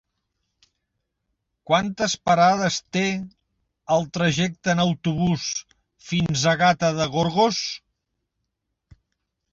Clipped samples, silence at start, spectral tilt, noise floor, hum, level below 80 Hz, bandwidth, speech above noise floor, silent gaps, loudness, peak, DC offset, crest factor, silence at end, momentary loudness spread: under 0.1%; 1.7 s; -4.5 dB/octave; -79 dBFS; none; -54 dBFS; 7.8 kHz; 58 dB; none; -22 LUFS; -6 dBFS; under 0.1%; 18 dB; 1.75 s; 9 LU